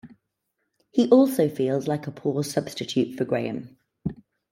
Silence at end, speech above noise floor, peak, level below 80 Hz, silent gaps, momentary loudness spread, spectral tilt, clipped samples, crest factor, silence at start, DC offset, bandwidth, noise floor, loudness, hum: 0.35 s; 55 dB; -4 dBFS; -62 dBFS; none; 17 LU; -6.5 dB/octave; under 0.1%; 20 dB; 0.05 s; under 0.1%; 16.5 kHz; -78 dBFS; -24 LUFS; none